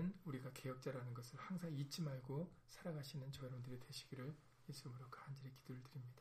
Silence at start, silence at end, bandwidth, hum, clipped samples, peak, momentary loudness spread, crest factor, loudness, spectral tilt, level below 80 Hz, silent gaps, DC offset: 0 s; 0 s; 15.5 kHz; none; under 0.1%; -36 dBFS; 9 LU; 16 dB; -52 LUFS; -6 dB/octave; -74 dBFS; none; under 0.1%